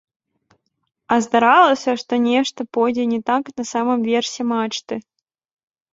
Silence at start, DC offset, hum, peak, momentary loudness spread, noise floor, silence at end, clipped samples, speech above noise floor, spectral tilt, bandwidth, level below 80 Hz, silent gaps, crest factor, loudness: 1.1 s; under 0.1%; none; -2 dBFS; 11 LU; -63 dBFS; 0.95 s; under 0.1%; 45 dB; -3.5 dB/octave; 7.8 kHz; -64 dBFS; none; 18 dB; -18 LUFS